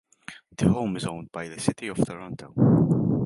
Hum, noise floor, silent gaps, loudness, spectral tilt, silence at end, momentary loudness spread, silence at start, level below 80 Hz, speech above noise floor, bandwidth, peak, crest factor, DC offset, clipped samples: none; -46 dBFS; none; -25 LUFS; -7 dB/octave; 0 s; 18 LU; 0.3 s; -50 dBFS; 23 dB; 11.5 kHz; -6 dBFS; 20 dB; under 0.1%; under 0.1%